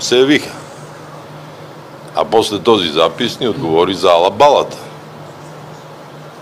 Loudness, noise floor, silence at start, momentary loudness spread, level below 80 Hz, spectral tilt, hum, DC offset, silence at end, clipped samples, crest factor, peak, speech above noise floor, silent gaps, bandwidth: -13 LUFS; -33 dBFS; 0 s; 23 LU; -54 dBFS; -4 dB/octave; none; under 0.1%; 0 s; under 0.1%; 16 dB; 0 dBFS; 21 dB; none; 15.5 kHz